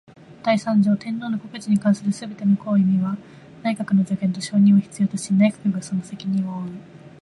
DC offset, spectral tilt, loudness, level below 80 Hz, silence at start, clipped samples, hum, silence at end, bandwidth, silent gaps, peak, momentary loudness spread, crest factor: under 0.1%; -7 dB/octave; -21 LUFS; -64 dBFS; 0.3 s; under 0.1%; none; 0.15 s; 11.5 kHz; none; -6 dBFS; 10 LU; 14 dB